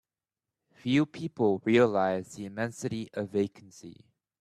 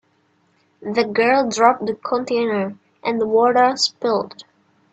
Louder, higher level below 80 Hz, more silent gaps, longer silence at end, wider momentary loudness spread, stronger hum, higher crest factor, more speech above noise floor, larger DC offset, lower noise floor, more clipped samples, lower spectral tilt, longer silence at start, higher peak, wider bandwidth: second, -29 LUFS vs -19 LUFS; about the same, -70 dBFS vs -66 dBFS; neither; about the same, 0.5 s vs 0.5 s; first, 16 LU vs 10 LU; neither; about the same, 20 dB vs 20 dB; first, over 61 dB vs 44 dB; neither; first, under -90 dBFS vs -62 dBFS; neither; first, -6.5 dB/octave vs -3.5 dB/octave; about the same, 0.85 s vs 0.8 s; second, -10 dBFS vs 0 dBFS; first, 13.5 kHz vs 8.8 kHz